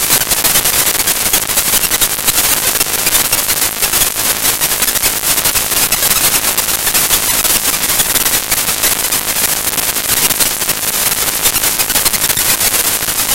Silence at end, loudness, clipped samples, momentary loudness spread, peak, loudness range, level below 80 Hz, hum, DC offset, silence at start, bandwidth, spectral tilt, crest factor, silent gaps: 0 s; -10 LUFS; under 0.1%; 3 LU; 0 dBFS; 1 LU; -34 dBFS; none; 0.6%; 0 s; over 20 kHz; 0 dB/octave; 14 dB; none